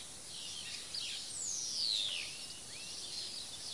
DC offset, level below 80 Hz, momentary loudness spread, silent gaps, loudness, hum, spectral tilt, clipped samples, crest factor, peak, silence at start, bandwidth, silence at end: 0.1%; -72 dBFS; 11 LU; none; -38 LUFS; none; 1 dB/octave; under 0.1%; 18 dB; -24 dBFS; 0 s; 11.5 kHz; 0 s